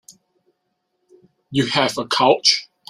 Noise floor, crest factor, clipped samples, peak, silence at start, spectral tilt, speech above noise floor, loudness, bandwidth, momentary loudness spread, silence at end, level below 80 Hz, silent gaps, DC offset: -73 dBFS; 20 dB; under 0.1%; -2 dBFS; 0.1 s; -3 dB/octave; 56 dB; -17 LUFS; 15 kHz; 8 LU; 0.25 s; -62 dBFS; none; under 0.1%